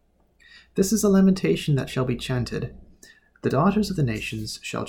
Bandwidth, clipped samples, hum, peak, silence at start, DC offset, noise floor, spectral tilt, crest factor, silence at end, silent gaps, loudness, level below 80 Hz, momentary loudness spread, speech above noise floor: 18 kHz; under 0.1%; none; -8 dBFS; 0.75 s; under 0.1%; -58 dBFS; -6 dB/octave; 16 dB; 0 s; none; -23 LUFS; -46 dBFS; 12 LU; 36 dB